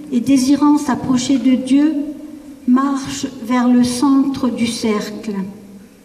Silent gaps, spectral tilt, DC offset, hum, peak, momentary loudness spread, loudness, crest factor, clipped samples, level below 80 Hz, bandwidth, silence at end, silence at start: none; -4.5 dB/octave; under 0.1%; none; -4 dBFS; 12 LU; -16 LUFS; 12 dB; under 0.1%; -52 dBFS; 14.5 kHz; 0.2 s; 0 s